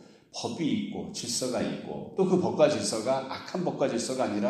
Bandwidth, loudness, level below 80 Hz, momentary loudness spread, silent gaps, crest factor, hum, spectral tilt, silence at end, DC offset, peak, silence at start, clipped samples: 14.5 kHz; -29 LUFS; -68 dBFS; 11 LU; none; 20 dB; none; -4.5 dB/octave; 0 s; under 0.1%; -8 dBFS; 0 s; under 0.1%